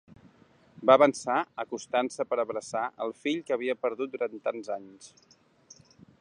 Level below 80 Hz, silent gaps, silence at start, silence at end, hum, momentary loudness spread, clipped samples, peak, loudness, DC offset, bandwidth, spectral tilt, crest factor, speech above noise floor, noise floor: -76 dBFS; none; 0.8 s; 1.15 s; none; 15 LU; under 0.1%; -6 dBFS; -28 LUFS; under 0.1%; 11 kHz; -4 dB/octave; 24 dB; 32 dB; -60 dBFS